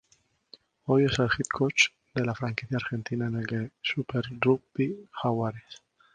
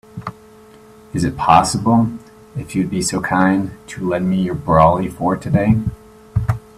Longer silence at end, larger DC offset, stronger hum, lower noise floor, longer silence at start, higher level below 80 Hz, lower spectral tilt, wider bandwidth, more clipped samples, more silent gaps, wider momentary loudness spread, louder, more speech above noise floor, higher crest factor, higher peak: first, 0.4 s vs 0.2 s; neither; neither; first, -68 dBFS vs -43 dBFS; first, 0.85 s vs 0.15 s; second, -58 dBFS vs -38 dBFS; about the same, -5 dB/octave vs -6 dB/octave; second, 10 kHz vs 14.5 kHz; neither; neither; second, 9 LU vs 16 LU; second, -28 LUFS vs -17 LUFS; first, 40 dB vs 27 dB; about the same, 22 dB vs 18 dB; second, -6 dBFS vs 0 dBFS